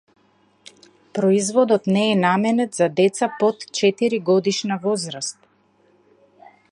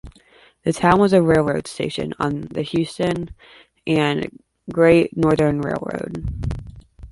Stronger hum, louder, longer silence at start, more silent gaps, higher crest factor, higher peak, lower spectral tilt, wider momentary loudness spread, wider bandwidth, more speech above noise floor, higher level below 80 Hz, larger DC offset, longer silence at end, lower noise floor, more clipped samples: neither; about the same, -20 LUFS vs -20 LUFS; first, 1.15 s vs 0.05 s; neither; about the same, 16 dB vs 18 dB; about the same, -4 dBFS vs -2 dBFS; second, -5 dB/octave vs -6.5 dB/octave; second, 6 LU vs 14 LU; about the same, 11.5 kHz vs 11.5 kHz; first, 41 dB vs 33 dB; second, -70 dBFS vs -40 dBFS; neither; first, 1.4 s vs 0.05 s; first, -60 dBFS vs -52 dBFS; neither